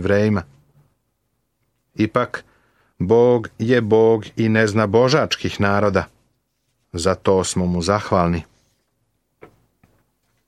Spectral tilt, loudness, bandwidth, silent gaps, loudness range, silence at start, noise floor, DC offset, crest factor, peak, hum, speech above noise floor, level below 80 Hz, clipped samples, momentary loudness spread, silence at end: -6 dB/octave; -18 LUFS; 12.5 kHz; none; 5 LU; 0 s; -71 dBFS; under 0.1%; 18 dB; -2 dBFS; none; 54 dB; -48 dBFS; under 0.1%; 11 LU; 2.05 s